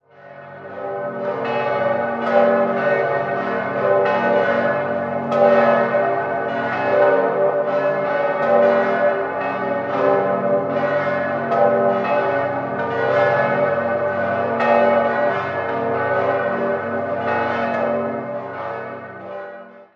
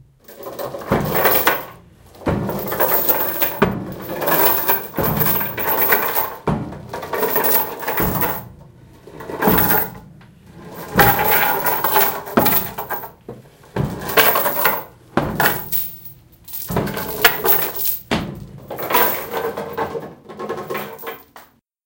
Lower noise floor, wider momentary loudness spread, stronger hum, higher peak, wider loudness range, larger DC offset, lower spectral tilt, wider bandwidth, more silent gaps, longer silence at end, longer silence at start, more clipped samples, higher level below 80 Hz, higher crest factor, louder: second, -40 dBFS vs -46 dBFS; second, 11 LU vs 17 LU; neither; about the same, -2 dBFS vs 0 dBFS; about the same, 3 LU vs 4 LU; neither; first, -7.5 dB/octave vs -4 dB/octave; second, 6.2 kHz vs 17.5 kHz; neither; second, 0.1 s vs 0.45 s; about the same, 0.2 s vs 0.3 s; neither; second, -60 dBFS vs -42 dBFS; about the same, 18 dB vs 20 dB; about the same, -19 LUFS vs -17 LUFS